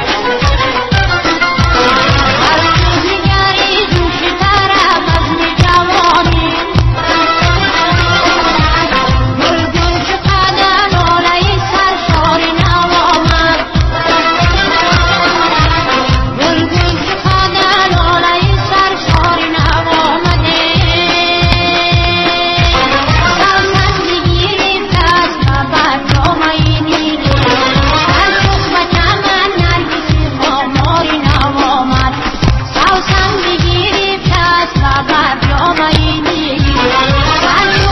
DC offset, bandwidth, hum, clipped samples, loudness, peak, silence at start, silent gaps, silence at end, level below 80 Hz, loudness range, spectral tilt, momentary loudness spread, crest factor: 0.3%; 9.8 kHz; none; under 0.1%; -10 LUFS; 0 dBFS; 0 s; none; 0 s; -20 dBFS; 1 LU; -5 dB/octave; 3 LU; 10 dB